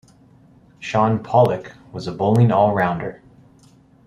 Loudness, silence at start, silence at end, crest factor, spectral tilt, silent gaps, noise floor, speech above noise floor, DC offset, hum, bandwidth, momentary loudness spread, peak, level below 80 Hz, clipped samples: -18 LUFS; 0.8 s; 0.9 s; 18 dB; -8 dB/octave; none; -51 dBFS; 33 dB; under 0.1%; none; 11 kHz; 16 LU; -2 dBFS; -54 dBFS; under 0.1%